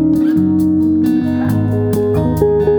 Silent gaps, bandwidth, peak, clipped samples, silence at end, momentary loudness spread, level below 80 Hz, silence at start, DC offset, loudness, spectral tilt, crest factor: none; over 20 kHz; -2 dBFS; under 0.1%; 0 s; 2 LU; -34 dBFS; 0 s; under 0.1%; -14 LUFS; -9 dB/octave; 12 dB